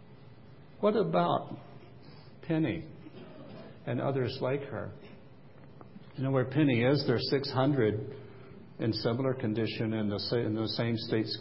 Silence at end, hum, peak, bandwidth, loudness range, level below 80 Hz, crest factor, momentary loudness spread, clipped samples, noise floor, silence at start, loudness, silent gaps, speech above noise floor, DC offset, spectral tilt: 0 s; none; -12 dBFS; 5.8 kHz; 6 LU; -62 dBFS; 18 dB; 22 LU; under 0.1%; -54 dBFS; 0 s; -31 LUFS; none; 24 dB; 0.2%; -10.5 dB/octave